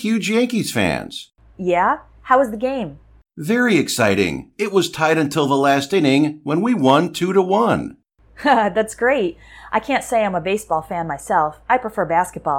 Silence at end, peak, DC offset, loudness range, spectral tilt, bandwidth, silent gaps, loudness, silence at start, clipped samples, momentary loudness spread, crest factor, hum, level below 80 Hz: 0 s; -2 dBFS; under 0.1%; 3 LU; -5 dB/octave; 18 kHz; none; -18 LUFS; 0 s; under 0.1%; 9 LU; 18 dB; none; -50 dBFS